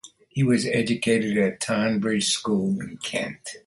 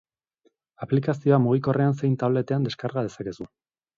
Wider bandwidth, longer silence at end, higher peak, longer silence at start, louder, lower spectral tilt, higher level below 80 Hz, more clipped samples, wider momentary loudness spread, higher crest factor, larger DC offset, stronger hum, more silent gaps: first, 11.5 kHz vs 7.4 kHz; second, 0.1 s vs 0.5 s; about the same, -8 dBFS vs -6 dBFS; second, 0.05 s vs 0.8 s; about the same, -24 LUFS vs -24 LUFS; second, -4.5 dB/octave vs -8.5 dB/octave; about the same, -60 dBFS vs -64 dBFS; neither; second, 8 LU vs 15 LU; about the same, 16 dB vs 18 dB; neither; neither; neither